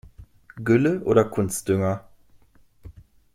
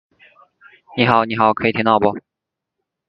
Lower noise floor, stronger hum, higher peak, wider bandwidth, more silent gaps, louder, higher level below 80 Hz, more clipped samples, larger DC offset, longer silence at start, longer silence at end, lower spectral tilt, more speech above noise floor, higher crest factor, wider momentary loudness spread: second, -55 dBFS vs -80 dBFS; neither; second, -4 dBFS vs 0 dBFS; first, 16.5 kHz vs 5.8 kHz; neither; second, -22 LUFS vs -16 LUFS; about the same, -52 dBFS vs -54 dBFS; neither; neither; second, 0.05 s vs 0.9 s; second, 0.45 s vs 0.9 s; second, -6.5 dB/octave vs -8.5 dB/octave; second, 34 dB vs 64 dB; about the same, 20 dB vs 20 dB; about the same, 9 LU vs 10 LU